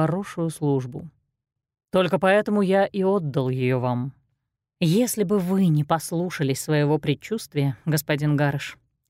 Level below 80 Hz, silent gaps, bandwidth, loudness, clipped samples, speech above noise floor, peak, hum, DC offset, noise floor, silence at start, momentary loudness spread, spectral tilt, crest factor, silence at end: -60 dBFS; none; 16 kHz; -23 LUFS; under 0.1%; 56 dB; -6 dBFS; none; under 0.1%; -78 dBFS; 0 s; 8 LU; -6 dB/octave; 16 dB; 0.35 s